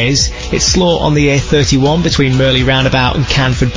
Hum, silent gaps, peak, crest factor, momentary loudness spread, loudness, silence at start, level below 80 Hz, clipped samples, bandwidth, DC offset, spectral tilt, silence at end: none; none; 0 dBFS; 12 dB; 2 LU; -11 LUFS; 0 s; -24 dBFS; under 0.1%; 7.6 kHz; 0.4%; -4.5 dB/octave; 0 s